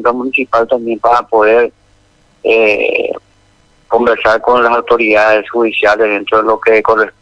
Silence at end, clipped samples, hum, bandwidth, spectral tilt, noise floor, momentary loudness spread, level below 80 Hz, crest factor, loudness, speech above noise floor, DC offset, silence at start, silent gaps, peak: 0.1 s; 0.2%; none; 8.6 kHz; -5 dB/octave; -50 dBFS; 5 LU; -46 dBFS; 12 dB; -11 LUFS; 39 dB; under 0.1%; 0 s; none; 0 dBFS